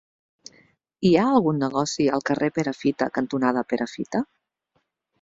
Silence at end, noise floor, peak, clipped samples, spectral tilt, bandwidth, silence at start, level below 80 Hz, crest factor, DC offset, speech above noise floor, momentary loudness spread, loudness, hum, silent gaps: 0.95 s; -72 dBFS; -4 dBFS; under 0.1%; -6 dB/octave; 7.8 kHz; 1 s; -60 dBFS; 20 dB; under 0.1%; 50 dB; 9 LU; -23 LUFS; none; none